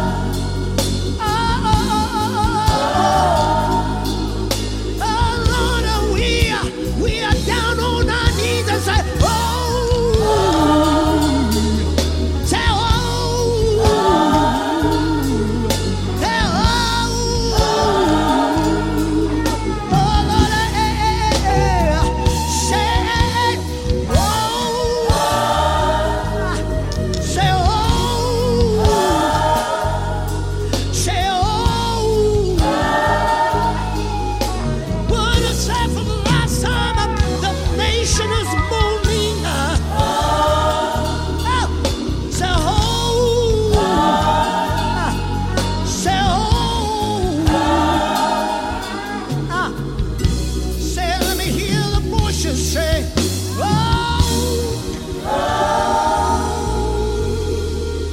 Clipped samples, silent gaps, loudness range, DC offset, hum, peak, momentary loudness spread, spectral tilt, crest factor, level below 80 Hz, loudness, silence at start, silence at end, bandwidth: under 0.1%; none; 2 LU; under 0.1%; none; -2 dBFS; 6 LU; -5 dB/octave; 14 dB; -24 dBFS; -17 LUFS; 0 s; 0 s; 16.5 kHz